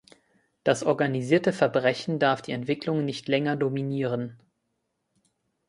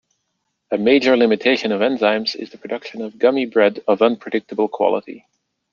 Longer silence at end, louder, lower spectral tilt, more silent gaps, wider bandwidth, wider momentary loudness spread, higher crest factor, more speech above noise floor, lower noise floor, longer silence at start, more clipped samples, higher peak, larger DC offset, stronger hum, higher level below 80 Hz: first, 1.35 s vs 0.55 s; second, -26 LUFS vs -18 LUFS; about the same, -6 dB/octave vs -5.5 dB/octave; neither; first, 11.5 kHz vs 7.2 kHz; second, 6 LU vs 13 LU; about the same, 20 dB vs 18 dB; second, 52 dB vs 56 dB; first, -78 dBFS vs -73 dBFS; about the same, 0.65 s vs 0.7 s; neither; second, -6 dBFS vs -2 dBFS; neither; neither; about the same, -70 dBFS vs -66 dBFS